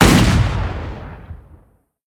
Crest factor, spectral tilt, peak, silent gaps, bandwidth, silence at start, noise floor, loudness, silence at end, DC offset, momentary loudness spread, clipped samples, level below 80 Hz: 18 dB; -5 dB/octave; 0 dBFS; none; 19.5 kHz; 0 s; -53 dBFS; -16 LUFS; 0.75 s; under 0.1%; 26 LU; under 0.1%; -24 dBFS